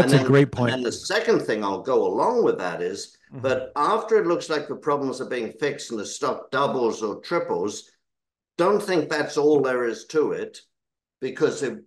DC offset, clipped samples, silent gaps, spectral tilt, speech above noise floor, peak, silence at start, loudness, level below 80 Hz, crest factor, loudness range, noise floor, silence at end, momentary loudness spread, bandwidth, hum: under 0.1%; under 0.1%; none; -5.5 dB/octave; 63 dB; -4 dBFS; 0 s; -23 LUFS; -64 dBFS; 20 dB; 3 LU; -86 dBFS; 0.05 s; 11 LU; 12.5 kHz; none